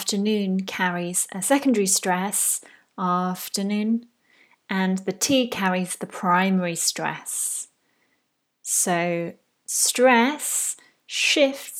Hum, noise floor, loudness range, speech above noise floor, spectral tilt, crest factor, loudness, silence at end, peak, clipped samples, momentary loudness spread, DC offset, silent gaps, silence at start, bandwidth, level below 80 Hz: none; -73 dBFS; 3 LU; 50 dB; -3 dB/octave; 20 dB; -22 LUFS; 0 s; -4 dBFS; under 0.1%; 11 LU; under 0.1%; none; 0 s; 17.5 kHz; -74 dBFS